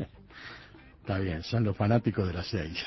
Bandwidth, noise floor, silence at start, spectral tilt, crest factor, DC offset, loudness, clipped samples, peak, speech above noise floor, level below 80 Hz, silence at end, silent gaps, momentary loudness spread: 6 kHz; -52 dBFS; 0 s; -7.5 dB/octave; 20 dB; under 0.1%; -30 LUFS; under 0.1%; -10 dBFS; 23 dB; -46 dBFS; 0 s; none; 19 LU